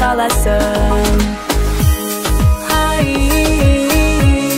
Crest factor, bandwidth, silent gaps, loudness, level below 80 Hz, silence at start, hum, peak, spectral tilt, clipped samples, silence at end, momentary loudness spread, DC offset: 12 dB; 16.5 kHz; none; -14 LUFS; -16 dBFS; 0 s; none; 0 dBFS; -5 dB/octave; under 0.1%; 0 s; 5 LU; under 0.1%